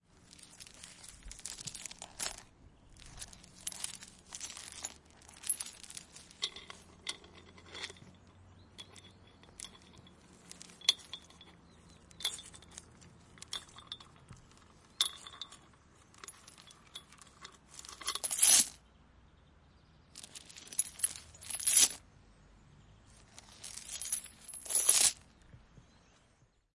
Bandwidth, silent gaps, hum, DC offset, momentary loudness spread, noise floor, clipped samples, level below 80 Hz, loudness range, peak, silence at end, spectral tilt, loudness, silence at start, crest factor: 12 kHz; none; none; under 0.1%; 27 LU; -69 dBFS; under 0.1%; -66 dBFS; 14 LU; -8 dBFS; 1.6 s; 1 dB/octave; -32 LUFS; 0.4 s; 30 dB